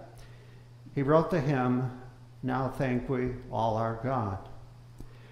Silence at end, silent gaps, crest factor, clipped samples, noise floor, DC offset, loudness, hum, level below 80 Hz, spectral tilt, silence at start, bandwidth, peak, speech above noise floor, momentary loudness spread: 0 s; none; 20 dB; under 0.1%; -51 dBFS; under 0.1%; -30 LUFS; none; -52 dBFS; -8.5 dB/octave; 0 s; 13 kHz; -10 dBFS; 22 dB; 25 LU